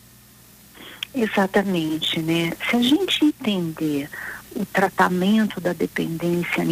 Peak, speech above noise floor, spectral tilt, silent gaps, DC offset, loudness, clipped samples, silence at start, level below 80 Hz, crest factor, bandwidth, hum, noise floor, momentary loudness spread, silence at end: -6 dBFS; 28 dB; -5 dB/octave; none; under 0.1%; -22 LUFS; under 0.1%; 0.75 s; -56 dBFS; 16 dB; 16 kHz; none; -49 dBFS; 12 LU; 0 s